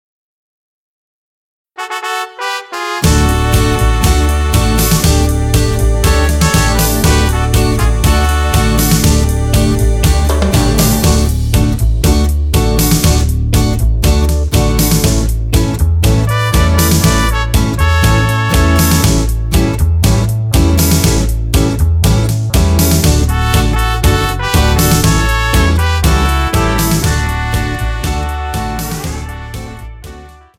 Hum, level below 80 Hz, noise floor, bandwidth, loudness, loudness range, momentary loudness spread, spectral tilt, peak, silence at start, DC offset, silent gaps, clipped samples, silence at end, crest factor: none; -14 dBFS; -33 dBFS; 17 kHz; -12 LUFS; 3 LU; 8 LU; -5 dB/octave; 0 dBFS; 1.8 s; 0.2%; none; under 0.1%; 0.25 s; 12 dB